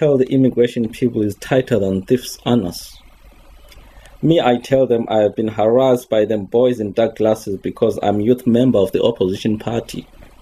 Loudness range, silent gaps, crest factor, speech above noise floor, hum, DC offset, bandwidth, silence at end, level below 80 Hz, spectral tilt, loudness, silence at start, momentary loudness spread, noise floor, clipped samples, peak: 4 LU; none; 16 dB; 27 dB; none; under 0.1%; 14.5 kHz; 0.15 s; -46 dBFS; -7 dB/octave; -17 LUFS; 0 s; 7 LU; -43 dBFS; under 0.1%; 0 dBFS